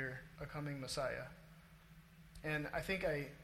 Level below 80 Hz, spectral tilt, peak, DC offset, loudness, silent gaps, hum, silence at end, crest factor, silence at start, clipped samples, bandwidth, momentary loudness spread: -60 dBFS; -5 dB/octave; -26 dBFS; under 0.1%; -43 LUFS; none; none; 0 s; 18 dB; 0 s; under 0.1%; 16.5 kHz; 23 LU